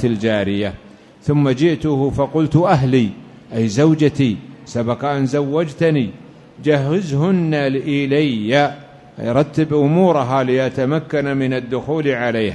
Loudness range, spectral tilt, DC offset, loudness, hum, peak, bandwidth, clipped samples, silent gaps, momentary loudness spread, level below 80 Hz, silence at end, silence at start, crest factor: 2 LU; -7.5 dB/octave; under 0.1%; -17 LUFS; none; -2 dBFS; 10 kHz; under 0.1%; none; 9 LU; -46 dBFS; 0 s; 0 s; 16 dB